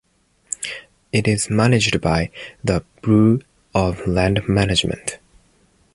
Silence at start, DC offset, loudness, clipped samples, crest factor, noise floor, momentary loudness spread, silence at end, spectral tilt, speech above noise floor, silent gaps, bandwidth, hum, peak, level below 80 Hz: 0.6 s; under 0.1%; -19 LUFS; under 0.1%; 18 dB; -58 dBFS; 12 LU; 0.8 s; -5 dB/octave; 40 dB; none; 11.5 kHz; none; -2 dBFS; -38 dBFS